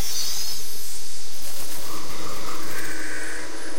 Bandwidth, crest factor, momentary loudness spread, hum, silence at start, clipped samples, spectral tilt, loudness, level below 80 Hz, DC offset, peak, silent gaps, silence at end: 16.5 kHz; 12 dB; 8 LU; none; 0 s; under 0.1%; -2 dB/octave; -31 LUFS; -52 dBFS; 20%; -10 dBFS; none; 0 s